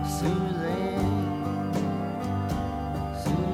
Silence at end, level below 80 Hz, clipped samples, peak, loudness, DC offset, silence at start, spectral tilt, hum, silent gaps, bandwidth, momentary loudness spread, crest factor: 0 s; -42 dBFS; under 0.1%; -14 dBFS; -29 LUFS; under 0.1%; 0 s; -7 dB/octave; none; none; 16 kHz; 4 LU; 14 dB